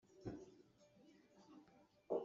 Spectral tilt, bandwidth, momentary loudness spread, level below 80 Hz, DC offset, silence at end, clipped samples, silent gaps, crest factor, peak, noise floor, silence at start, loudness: -7.5 dB/octave; 7.4 kHz; 17 LU; -78 dBFS; under 0.1%; 0 s; under 0.1%; none; 22 dB; -30 dBFS; -71 dBFS; 0.15 s; -55 LUFS